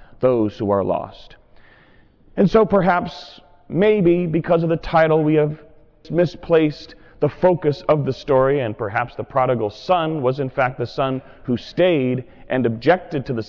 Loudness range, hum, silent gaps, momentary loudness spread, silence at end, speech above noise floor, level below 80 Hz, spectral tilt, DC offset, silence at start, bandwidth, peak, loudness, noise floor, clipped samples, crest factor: 3 LU; none; none; 10 LU; 0 s; 32 dB; -46 dBFS; -8.5 dB/octave; under 0.1%; 0.2 s; 6 kHz; -6 dBFS; -19 LUFS; -51 dBFS; under 0.1%; 14 dB